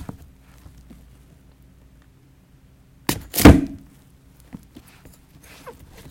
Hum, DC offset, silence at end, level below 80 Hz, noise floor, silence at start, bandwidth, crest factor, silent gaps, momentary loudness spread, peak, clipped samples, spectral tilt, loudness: none; under 0.1%; 2.35 s; -32 dBFS; -53 dBFS; 3.1 s; 17 kHz; 24 dB; none; 31 LU; 0 dBFS; under 0.1%; -5.5 dB/octave; -16 LUFS